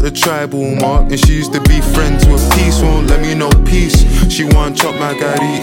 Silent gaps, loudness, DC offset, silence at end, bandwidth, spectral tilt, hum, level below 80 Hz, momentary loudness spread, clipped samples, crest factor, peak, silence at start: none; -12 LUFS; under 0.1%; 0 s; 17 kHz; -5 dB/octave; none; -12 dBFS; 4 LU; under 0.1%; 10 dB; 0 dBFS; 0 s